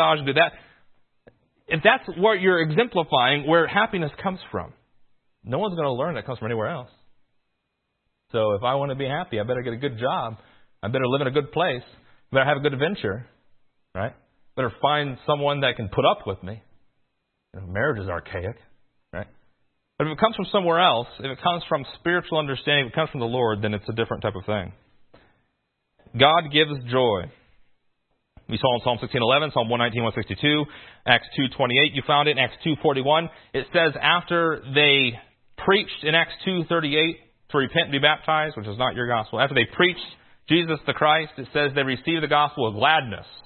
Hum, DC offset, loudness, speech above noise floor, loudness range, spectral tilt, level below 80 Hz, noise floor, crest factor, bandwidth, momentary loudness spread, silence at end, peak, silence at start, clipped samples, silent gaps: none; under 0.1%; -22 LUFS; 54 dB; 7 LU; -10 dB/octave; -56 dBFS; -77 dBFS; 24 dB; 4.4 kHz; 13 LU; 0.05 s; 0 dBFS; 0 s; under 0.1%; none